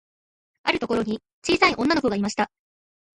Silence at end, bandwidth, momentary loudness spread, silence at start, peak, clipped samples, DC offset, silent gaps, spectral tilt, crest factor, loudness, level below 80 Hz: 0.7 s; 11.5 kHz; 10 LU; 0.65 s; -6 dBFS; under 0.1%; under 0.1%; 1.33-1.42 s; -4 dB/octave; 20 dB; -23 LUFS; -54 dBFS